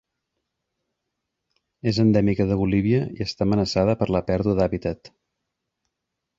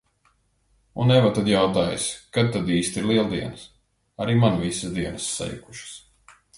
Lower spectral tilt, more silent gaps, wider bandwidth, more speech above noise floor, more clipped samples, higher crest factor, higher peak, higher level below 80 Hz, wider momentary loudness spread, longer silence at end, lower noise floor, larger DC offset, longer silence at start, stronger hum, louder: first, -7.5 dB/octave vs -5.5 dB/octave; neither; second, 7.8 kHz vs 11.5 kHz; first, 61 dB vs 43 dB; neither; about the same, 18 dB vs 18 dB; about the same, -6 dBFS vs -6 dBFS; first, -44 dBFS vs -50 dBFS; second, 10 LU vs 19 LU; first, 1.3 s vs 0.6 s; first, -82 dBFS vs -65 dBFS; neither; first, 1.85 s vs 0.95 s; neither; about the same, -22 LUFS vs -23 LUFS